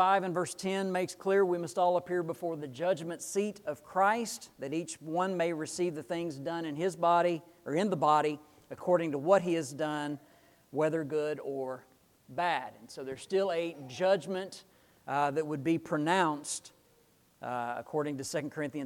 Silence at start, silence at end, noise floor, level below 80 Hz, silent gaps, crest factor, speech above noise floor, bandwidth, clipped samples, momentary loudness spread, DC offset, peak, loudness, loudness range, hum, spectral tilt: 0 s; 0 s; -66 dBFS; -76 dBFS; none; 20 dB; 35 dB; 18 kHz; under 0.1%; 12 LU; under 0.1%; -12 dBFS; -32 LUFS; 4 LU; none; -5 dB/octave